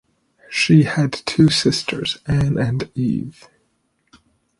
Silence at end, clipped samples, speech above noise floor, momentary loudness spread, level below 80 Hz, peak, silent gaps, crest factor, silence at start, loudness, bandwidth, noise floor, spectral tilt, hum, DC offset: 1.3 s; under 0.1%; 49 dB; 10 LU; -46 dBFS; -2 dBFS; none; 18 dB; 0.5 s; -18 LUFS; 11.5 kHz; -67 dBFS; -5.5 dB/octave; none; under 0.1%